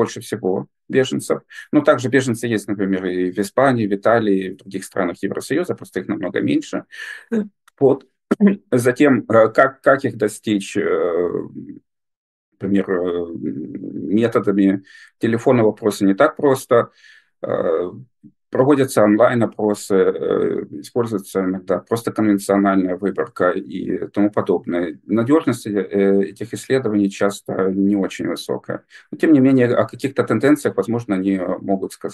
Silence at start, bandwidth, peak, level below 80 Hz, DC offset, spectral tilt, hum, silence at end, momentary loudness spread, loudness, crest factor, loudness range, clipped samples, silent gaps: 0 s; 12.5 kHz; 0 dBFS; -64 dBFS; under 0.1%; -6.5 dB/octave; none; 0 s; 11 LU; -19 LUFS; 18 dB; 5 LU; under 0.1%; 12.16-12.52 s